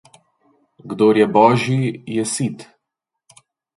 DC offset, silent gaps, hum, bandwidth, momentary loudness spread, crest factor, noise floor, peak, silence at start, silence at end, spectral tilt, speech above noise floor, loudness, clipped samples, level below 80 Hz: under 0.1%; none; none; 12 kHz; 13 LU; 20 dB; -81 dBFS; 0 dBFS; 0.85 s; 1.15 s; -5.5 dB/octave; 65 dB; -17 LUFS; under 0.1%; -60 dBFS